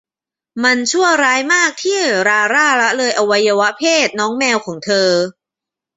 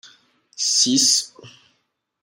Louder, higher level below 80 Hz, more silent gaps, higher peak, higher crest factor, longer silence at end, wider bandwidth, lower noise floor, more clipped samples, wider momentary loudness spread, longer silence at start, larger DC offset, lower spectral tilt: about the same, -14 LUFS vs -16 LUFS; first, -64 dBFS vs -74 dBFS; neither; first, 0 dBFS vs -4 dBFS; second, 14 dB vs 20 dB; about the same, 0.65 s vs 0.75 s; second, 8.2 kHz vs 16 kHz; first, -88 dBFS vs -71 dBFS; neither; second, 5 LU vs 11 LU; about the same, 0.55 s vs 0.6 s; neither; first, -2 dB/octave vs -0.5 dB/octave